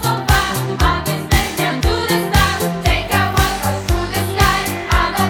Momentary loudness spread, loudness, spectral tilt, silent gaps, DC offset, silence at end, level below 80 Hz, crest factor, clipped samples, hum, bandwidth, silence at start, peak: 4 LU; -16 LUFS; -4.5 dB/octave; none; under 0.1%; 0 s; -22 dBFS; 16 dB; under 0.1%; none; 18.5 kHz; 0 s; 0 dBFS